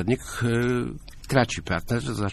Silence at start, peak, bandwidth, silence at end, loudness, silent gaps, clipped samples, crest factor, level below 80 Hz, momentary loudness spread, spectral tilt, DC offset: 0 s; -6 dBFS; 14.5 kHz; 0 s; -26 LUFS; none; under 0.1%; 20 dB; -42 dBFS; 6 LU; -5.5 dB/octave; under 0.1%